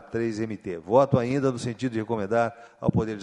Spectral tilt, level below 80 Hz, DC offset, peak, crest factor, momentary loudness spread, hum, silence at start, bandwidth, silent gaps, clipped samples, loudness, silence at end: -7.5 dB/octave; -54 dBFS; under 0.1%; -6 dBFS; 20 dB; 9 LU; none; 0 s; 11 kHz; none; under 0.1%; -26 LUFS; 0 s